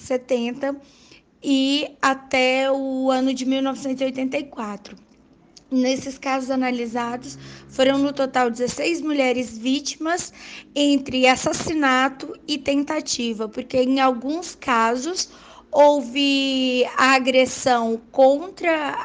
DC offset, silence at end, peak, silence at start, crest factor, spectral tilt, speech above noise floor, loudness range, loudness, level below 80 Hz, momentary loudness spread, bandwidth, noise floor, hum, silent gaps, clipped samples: under 0.1%; 0 s; -4 dBFS; 0 s; 18 dB; -3 dB/octave; 32 dB; 6 LU; -21 LUFS; -58 dBFS; 11 LU; 9.8 kHz; -53 dBFS; none; none; under 0.1%